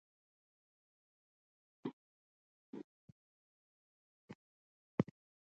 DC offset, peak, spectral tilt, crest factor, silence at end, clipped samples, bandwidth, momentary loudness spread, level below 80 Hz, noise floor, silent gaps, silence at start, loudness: under 0.1%; -18 dBFS; -8.5 dB/octave; 34 dB; 0.45 s; under 0.1%; 7.2 kHz; 20 LU; -80 dBFS; under -90 dBFS; 1.93-2.73 s, 2.84-4.28 s, 4.35-4.98 s; 1.85 s; -46 LUFS